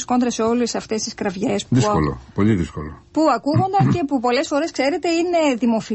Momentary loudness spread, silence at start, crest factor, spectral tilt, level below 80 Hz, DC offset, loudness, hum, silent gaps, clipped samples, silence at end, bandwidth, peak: 6 LU; 0 s; 14 dB; -5.5 dB/octave; -42 dBFS; under 0.1%; -20 LUFS; none; none; under 0.1%; 0 s; 8.4 kHz; -4 dBFS